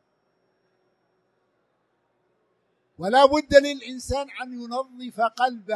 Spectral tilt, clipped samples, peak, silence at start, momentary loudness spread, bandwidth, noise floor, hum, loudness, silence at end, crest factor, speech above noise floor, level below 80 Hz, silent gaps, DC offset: -4 dB/octave; under 0.1%; -2 dBFS; 3 s; 16 LU; 12.5 kHz; -71 dBFS; none; -22 LUFS; 0 s; 24 dB; 49 dB; -50 dBFS; none; under 0.1%